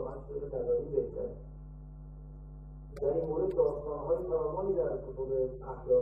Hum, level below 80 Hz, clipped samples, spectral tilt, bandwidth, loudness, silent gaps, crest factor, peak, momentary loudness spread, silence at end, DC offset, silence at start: none; -48 dBFS; under 0.1%; -11 dB/octave; 2.5 kHz; -34 LUFS; none; 18 dB; -16 dBFS; 19 LU; 0 s; under 0.1%; 0 s